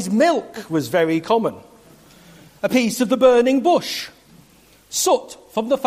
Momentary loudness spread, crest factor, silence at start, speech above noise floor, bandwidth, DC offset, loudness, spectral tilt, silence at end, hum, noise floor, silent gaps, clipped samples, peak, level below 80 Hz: 12 LU; 16 dB; 0 s; 33 dB; 15.5 kHz; under 0.1%; -19 LUFS; -4 dB/octave; 0 s; none; -51 dBFS; none; under 0.1%; -4 dBFS; -60 dBFS